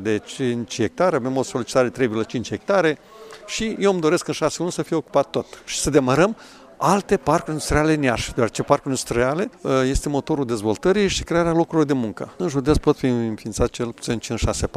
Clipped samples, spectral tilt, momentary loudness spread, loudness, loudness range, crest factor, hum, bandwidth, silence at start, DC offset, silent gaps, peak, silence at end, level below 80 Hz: under 0.1%; -5 dB/octave; 7 LU; -21 LUFS; 2 LU; 20 dB; none; 15.5 kHz; 0 s; under 0.1%; none; 0 dBFS; 0.1 s; -38 dBFS